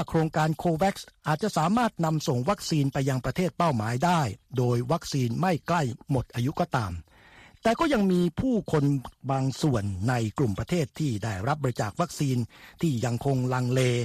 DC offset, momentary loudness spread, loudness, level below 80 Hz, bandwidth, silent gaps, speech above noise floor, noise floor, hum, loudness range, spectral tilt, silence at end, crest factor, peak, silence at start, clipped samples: under 0.1%; 5 LU; -27 LUFS; -50 dBFS; 14.5 kHz; none; 27 dB; -53 dBFS; none; 2 LU; -6.5 dB/octave; 0 s; 16 dB; -10 dBFS; 0 s; under 0.1%